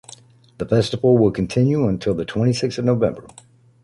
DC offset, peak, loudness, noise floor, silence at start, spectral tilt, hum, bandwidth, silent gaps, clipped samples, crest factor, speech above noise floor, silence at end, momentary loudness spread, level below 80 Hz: under 0.1%; -4 dBFS; -19 LUFS; -46 dBFS; 0.6 s; -7 dB/octave; none; 11.5 kHz; none; under 0.1%; 16 dB; 28 dB; 0.6 s; 7 LU; -46 dBFS